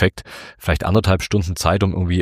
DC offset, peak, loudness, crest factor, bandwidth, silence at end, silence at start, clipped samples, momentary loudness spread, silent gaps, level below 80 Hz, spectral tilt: under 0.1%; 0 dBFS; -19 LUFS; 18 dB; 15.5 kHz; 0 s; 0 s; under 0.1%; 12 LU; none; -32 dBFS; -6 dB/octave